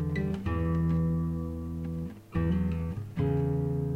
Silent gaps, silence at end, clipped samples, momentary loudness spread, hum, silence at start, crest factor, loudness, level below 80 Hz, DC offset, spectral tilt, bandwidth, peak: none; 0 s; under 0.1%; 8 LU; none; 0 s; 12 dB; -31 LUFS; -40 dBFS; under 0.1%; -9.5 dB/octave; 4.7 kHz; -18 dBFS